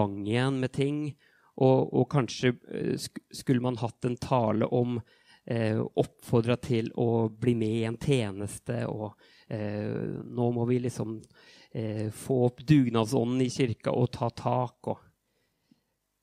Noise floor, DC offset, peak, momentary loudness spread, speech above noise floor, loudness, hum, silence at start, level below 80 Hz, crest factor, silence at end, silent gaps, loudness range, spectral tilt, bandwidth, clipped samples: -75 dBFS; under 0.1%; -8 dBFS; 11 LU; 47 dB; -29 LUFS; none; 0 s; -62 dBFS; 20 dB; 1.25 s; none; 4 LU; -7 dB/octave; 15 kHz; under 0.1%